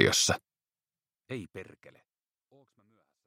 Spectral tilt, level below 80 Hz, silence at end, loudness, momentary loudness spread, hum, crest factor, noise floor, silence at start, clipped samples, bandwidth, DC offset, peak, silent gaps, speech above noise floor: -2.5 dB/octave; -64 dBFS; 1.65 s; -30 LUFS; 23 LU; none; 28 dB; under -90 dBFS; 0 s; under 0.1%; 16 kHz; under 0.1%; -6 dBFS; none; over 59 dB